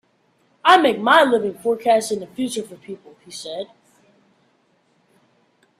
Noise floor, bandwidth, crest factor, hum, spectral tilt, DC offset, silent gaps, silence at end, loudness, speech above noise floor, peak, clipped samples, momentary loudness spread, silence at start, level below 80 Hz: -62 dBFS; 14.5 kHz; 22 dB; none; -3 dB/octave; under 0.1%; none; 2.15 s; -18 LUFS; 43 dB; 0 dBFS; under 0.1%; 23 LU; 0.65 s; -68 dBFS